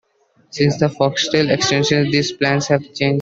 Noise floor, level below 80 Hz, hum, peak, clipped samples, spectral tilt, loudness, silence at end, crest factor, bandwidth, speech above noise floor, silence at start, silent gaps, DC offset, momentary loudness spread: -57 dBFS; -52 dBFS; none; -2 dBFS; under 0.1%; -4.5 dB/octave; -17 LUFS; 0 s; 16 dB; 7.8 kHz; 40 dB; 0.55 s; none; under 0.1%; 4 LU